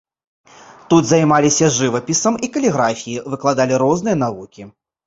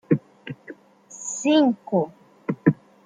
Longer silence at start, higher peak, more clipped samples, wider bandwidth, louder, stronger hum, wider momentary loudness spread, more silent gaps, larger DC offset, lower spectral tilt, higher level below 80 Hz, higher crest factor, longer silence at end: first, 0.9 s vs 0.1 s; about the same, -2 dBFS vs -2 dBFS; neither; second, 8 kHz vs 9.6 kHz; first, -16 LUFS vs -23 LUFS; neither; second, 11 LU vs 21 LU; neither; neither; about the same, -4.5 dB/octave vs -5.5 dB/octave; first, -54 dBFS vs -68 dBFS; second, 16 dB vs 22 dB; about the same, 0.35 s vs 0.3 s